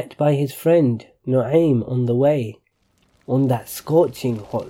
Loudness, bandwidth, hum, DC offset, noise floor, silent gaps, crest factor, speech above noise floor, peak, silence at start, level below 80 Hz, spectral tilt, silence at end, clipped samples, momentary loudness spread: -19 LUFS; 17 kHz; none; under 0.1%; -63 dBFS; none; 14 dB; 44 dB; -4 dBFS; 0 s; -58 dBFS; -8 dB/octave; 0 s; under 0.1%; 8 LU